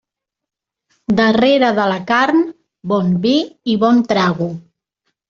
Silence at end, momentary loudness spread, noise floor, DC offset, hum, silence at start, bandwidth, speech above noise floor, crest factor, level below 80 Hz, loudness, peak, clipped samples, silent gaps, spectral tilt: 0.7 s; 12 LU; -84 dBFS; under 0.1%; none; 1.1 s; 7.2 kHz; 69 dB; 14 dB; -54 dBFS; -15 LUFS; -2 dBFS; under 0.1%; none; -6.5 dB/octave